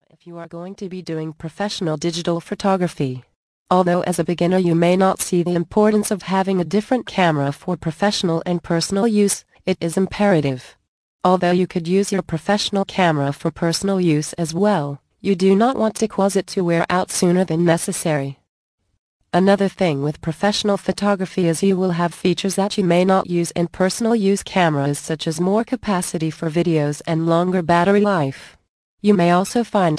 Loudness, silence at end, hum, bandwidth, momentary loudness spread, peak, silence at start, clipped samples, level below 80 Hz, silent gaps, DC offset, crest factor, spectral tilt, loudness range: -19 LUFS; 0 s; none; 11 kHz; 8 LU; -2 dBFS; 0.25 s; under 0.1%; -52 dBFS; 3.36-3.66 s, 10.88-11.19 s, 18.49-18.78 s, 18.98-19.20 s, 28.69-28.98 s; under 0.1%; 18 dB; -5.5 dB/octave; 2 LU